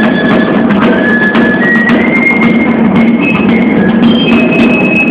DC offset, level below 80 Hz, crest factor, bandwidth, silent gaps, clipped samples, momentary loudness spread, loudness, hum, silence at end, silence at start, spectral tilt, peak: under 0.1%; -38 dBFS; 6 dB; 6 kHz; none; 0.8%; 2 LU; -7 LUFS; none; 0 s; 0 s; -7.5 dB/octave; 0 dBFS